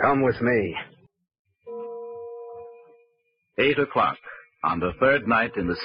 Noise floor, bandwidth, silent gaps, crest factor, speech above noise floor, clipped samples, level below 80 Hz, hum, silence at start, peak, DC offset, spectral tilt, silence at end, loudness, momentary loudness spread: -71 dBFS; 5.4 kHz; 1.39-1.45 s; 18 dB; 48 dB; under 0.1%; -54 dBFS; none; 0 s; -8 dBFS; under 0.1%; -9.5 dB/octave; 0 s; -23 LUFS; 19 LU